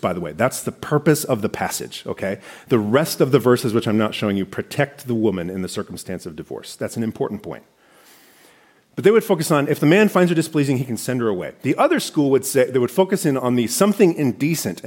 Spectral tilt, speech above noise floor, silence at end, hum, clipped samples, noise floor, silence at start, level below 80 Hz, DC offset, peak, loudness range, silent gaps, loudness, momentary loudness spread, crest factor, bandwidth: -5.5 dB/octave; 35 dB; 0 s; none; under 0.1%; -54 dBFS; 0.05 s; -60 dBFS; under 0.1%; -2 dBFS; 8 LU; none; -19 LUFS; 13 LU; 18 dB; 17 kHz